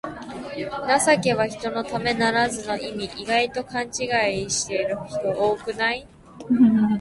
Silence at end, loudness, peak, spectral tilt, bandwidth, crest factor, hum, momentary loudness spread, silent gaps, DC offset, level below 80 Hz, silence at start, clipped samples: 0 s; -23 LUFS; -4 dBFS; -4 dB/octave; 11.5 kHz; 18 dB; none; 13 LU; none; under 0.1%; -54 dBFS; 0.05 s; under 0.1%